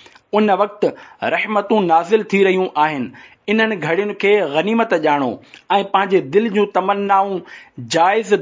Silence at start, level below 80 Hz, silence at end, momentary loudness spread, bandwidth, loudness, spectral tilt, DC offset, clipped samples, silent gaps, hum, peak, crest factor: 0.35 s; -66 dBFS; 0 s; 9 LU; 7.6 kHz; -17 LUFS; -5.5 dB/octave; under 0.1%; under 0.1%; none; none; -2 dBFS; 14 dB